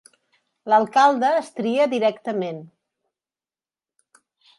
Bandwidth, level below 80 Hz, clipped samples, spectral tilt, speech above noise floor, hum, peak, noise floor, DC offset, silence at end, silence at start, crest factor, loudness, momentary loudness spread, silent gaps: 11.5 kHz; -76 dBFS; under 0.1%; -5 dB/octave; over 70 dB; none; -4 dBFS; under -90 dBFS; under 0.1%; 1.95 s; 0.65 s; 20 dB; -20 LUFS; 14 LU; none